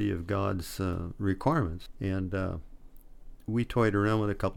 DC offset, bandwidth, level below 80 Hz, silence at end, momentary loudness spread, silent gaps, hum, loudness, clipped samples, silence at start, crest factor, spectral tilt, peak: under 0.1%; 17 kHz; -46 dBFS; 0 s; 9 LU; none; none; -30 LUFS; under 0.1%; 0 s; 18 dB; -7.5 dB/octave; -12 dBFS